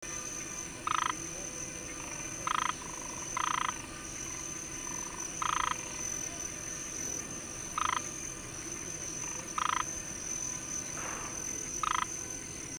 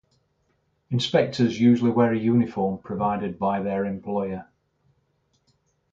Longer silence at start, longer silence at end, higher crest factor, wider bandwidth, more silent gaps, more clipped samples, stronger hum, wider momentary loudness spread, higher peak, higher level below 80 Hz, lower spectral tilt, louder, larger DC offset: second, 0 s vs 0.9 s; second, 0 s vs 1.5 s; about the same, 20 dB vs 18 dB; first, over 20 kHz vs 7.6 kHz; neither; neither; neither; about the same, 7 LU vs 9 LU; second, -16 dBFS vs -8 dBFS; about the same, -56 dBFS vs -58 dBFS; second, -1.5 dB/octave vs -7 dB/octave; second, -35 LUFS vs -23 LUFS; neither